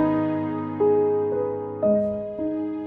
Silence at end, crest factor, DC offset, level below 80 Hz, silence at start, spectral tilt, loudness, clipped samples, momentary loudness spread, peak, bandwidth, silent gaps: 0 s; 12 dB; under 0.1%; -56 dBFS; 0 s; -11 dB/octave; -24 LUFS; under 0.1%; 8 LU; -10 dBFS; 4 kHz; none